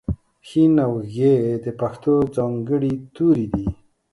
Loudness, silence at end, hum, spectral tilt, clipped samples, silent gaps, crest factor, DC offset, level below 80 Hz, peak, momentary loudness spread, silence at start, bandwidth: -20 LUFS; 0.4 s; none; -9.5 dB/octave; under 0.1%; none; 16 dB; under 0.1%; -42 dBFS; -4 dBFS; 10 LU; 0.1 s; 11.5 kHz